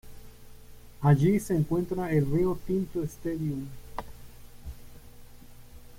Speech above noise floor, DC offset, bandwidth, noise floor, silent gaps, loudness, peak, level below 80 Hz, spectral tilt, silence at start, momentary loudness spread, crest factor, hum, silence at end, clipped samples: 21 dB; under 0.1%; 16.5 kHz; -47 dBFS; none; -28 LUFS; -10 dBFS; -48 dBFS; -8 dB/octave; 0.05 s; 24 LU; 20 dB; 60 Hz at -50 dBFS; 0 s; under 0.1%